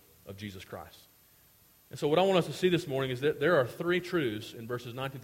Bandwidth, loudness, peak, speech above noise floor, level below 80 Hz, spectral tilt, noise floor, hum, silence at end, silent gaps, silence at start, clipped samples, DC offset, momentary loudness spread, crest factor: 16.5 kHz; -30 LUFS; -12 dBFS; 32 dB; -66 dBFS; -6 dB/octave; -62 dBFS; none; 0 s; none; 0.25 s; under 0.1%; under 0.1%; 19 LU; 20 dB